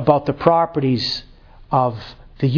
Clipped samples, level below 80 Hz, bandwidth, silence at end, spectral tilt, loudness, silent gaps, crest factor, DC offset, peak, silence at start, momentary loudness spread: under 0.1%; -46 dBFS; 5.4 kHz; 0 s; -7.5 dB/octave; -19 LUFS; none; 18 dB; under 0.1%; 0 dBFS; 0 s; 12 LU